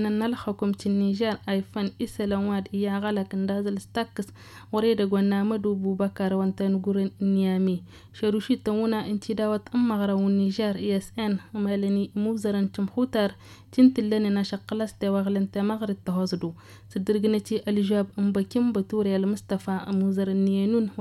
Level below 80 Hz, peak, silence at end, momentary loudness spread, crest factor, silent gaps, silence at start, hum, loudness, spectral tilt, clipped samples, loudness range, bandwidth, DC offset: -60 dBFS; -8 dBFS; 0 s; 6 LU; 18 dB; none; 0 s; none; -26 LUFS; -7.5 dB/octave; under 0.1%; 2 LU; 12.5 kHz; under 0.1%